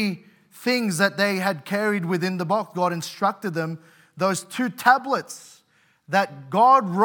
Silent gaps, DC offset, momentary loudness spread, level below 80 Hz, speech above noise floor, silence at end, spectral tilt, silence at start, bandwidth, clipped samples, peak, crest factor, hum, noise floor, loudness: none; under 0.1%; 11 LU; -82 dBFS; 40 dB; 0 s; -4.5 dB/octave; 0 s; 18 kHz; under 0.1%; -4 dBFS; 20 dB; none; -62 dBFS; -23 LUFS